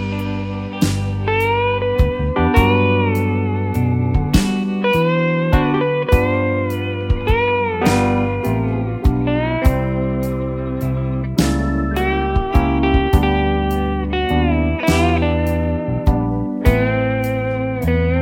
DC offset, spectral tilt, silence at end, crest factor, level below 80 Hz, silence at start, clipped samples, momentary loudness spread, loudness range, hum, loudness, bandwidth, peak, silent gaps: under 0.1%; -7 dB/octave; 0 s; 16 dB; -24 dBFS; 0 s; under 0.1%; 5 LU; 2 LU; none; -18 LUFS; 17 kHz; 0 dBFS; none